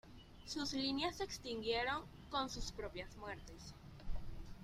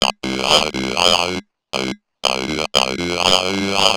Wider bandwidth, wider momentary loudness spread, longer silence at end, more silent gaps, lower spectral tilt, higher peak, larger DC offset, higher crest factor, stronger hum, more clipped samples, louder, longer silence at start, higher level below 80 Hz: second, 15 kHz vs over 20 kHz; first, 17 LU vs 9 LU; about the same, 0 s vs 0 s; neither; about the same, -3.5 dB/octave vs -2.5 dB/octave; second, -24 dBFS vs 0 dBFS; neither; about the same, 18 dB vs 18 dB; neither; second, under 0.1% vs 0.1%; second, -43 LUFS vs -17 LUFS; about the same, 0.05 s vs 0 s; second, -54 dBFS vs -44 dBFS